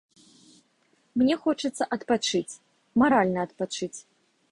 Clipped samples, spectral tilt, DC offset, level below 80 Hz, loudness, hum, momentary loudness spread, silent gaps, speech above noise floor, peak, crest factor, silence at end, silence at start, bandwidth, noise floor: under 0.1%; -4.5 dB/octave; under 0.1%; -64 dBFS; -26 LUFS; none; 15 LU; none; 42 dB; -8 dBFS; 20 dB; 0.5 s; 1.15 s; 11.5 kHz; -67 dBFS